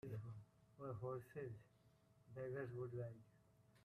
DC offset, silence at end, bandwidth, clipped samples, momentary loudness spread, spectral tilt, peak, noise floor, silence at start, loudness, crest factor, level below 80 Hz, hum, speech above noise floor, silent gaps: under 0.1%; 0 s; 14 kHz; under 0.1%; 12 LU; -9 dB/octave; -38 dBFS; -74 dBFS; 0.05 s; -52 LUFS; 16 dB; -80 dBFS; none; 24 dB; none